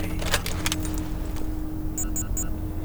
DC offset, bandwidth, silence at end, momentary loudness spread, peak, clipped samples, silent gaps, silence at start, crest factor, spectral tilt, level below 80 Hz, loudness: under 0.1%; over 20 kHz; 0 s; 7 LU; -6 dBFS; under 0.1%; none; 0 s; 20 dB; -3.5 dB/octave; -32 dBFS; -29 LUFS